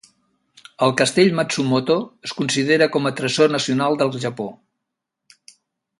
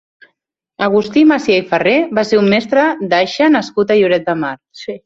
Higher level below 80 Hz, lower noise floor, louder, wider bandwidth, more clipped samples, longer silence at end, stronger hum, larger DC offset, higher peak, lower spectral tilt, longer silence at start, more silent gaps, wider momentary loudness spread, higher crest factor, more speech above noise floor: second, -64 dBFS vs -56 dBFS; first, -80 dBFS vs -69 dBFS; second, -19 LUFS vs -13 LUFS; first, 11.5 kHz vs 7.8 kHz; neither; first, 1.45 s vs 0.1 s; neither; neither; about the same, -2 dBFS vs 0 dBFS; about the same, -4.5 dB/octave vs -5.5 dB/octave; about the same, 0.8 s vs 0.8 s; neither; about the same, 10 LU vs 8 LU; first, 20 dB vs 12 dB; first, 62 dB vs 56 dB